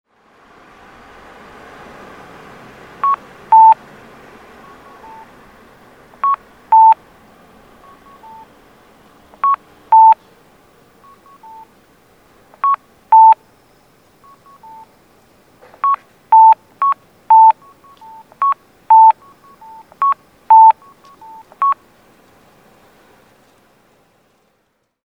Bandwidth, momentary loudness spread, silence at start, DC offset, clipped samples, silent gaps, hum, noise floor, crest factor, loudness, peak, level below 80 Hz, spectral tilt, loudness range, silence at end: 4.4 kHz; 14 LU; 3.05 s; under 0.1%; under 0.1%; none; none; -65 dBFS; 16 dB; -12 LUFS; 0 dBFS; -60 dBFS; -4 dB/octave; 7 LU; 3.3 s